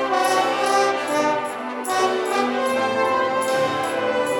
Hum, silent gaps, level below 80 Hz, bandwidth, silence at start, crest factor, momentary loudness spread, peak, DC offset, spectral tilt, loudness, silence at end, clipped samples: none; none; -68 dBFS; 17.5 kHz; 0 s; 14 dB; 4 LU; -6 dBFS; under 0.1%; -3 dB/octave; -21 LUFS; 0 s; under 0.1%